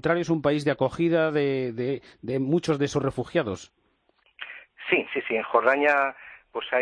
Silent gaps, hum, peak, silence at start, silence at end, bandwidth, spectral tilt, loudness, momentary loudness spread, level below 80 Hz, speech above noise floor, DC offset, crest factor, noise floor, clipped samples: none; none; -6 dBFS; 0 s; 0 s; 10.5 kHz; -6 dB/octave; -25 LUFS; 16 LU; -58 dBFS; 42 dB; under 0.1%; 20 dB; -67 dBFS; under 0.1%